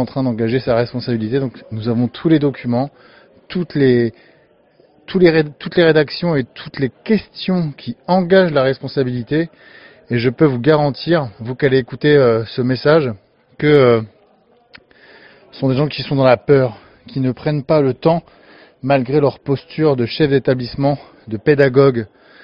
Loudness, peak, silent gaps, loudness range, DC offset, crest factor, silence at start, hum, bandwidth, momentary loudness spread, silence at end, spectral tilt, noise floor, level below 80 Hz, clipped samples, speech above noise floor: -16 LUFS; 0 dBFS; none; 3 LU; under 0.1%; 16 dB; 0 s; none; 5.6 kHz; 11 LU; 0.4 s; -6 dB/octave; -53 dBFS; -50 dBFS; under 0.1%; 38 dB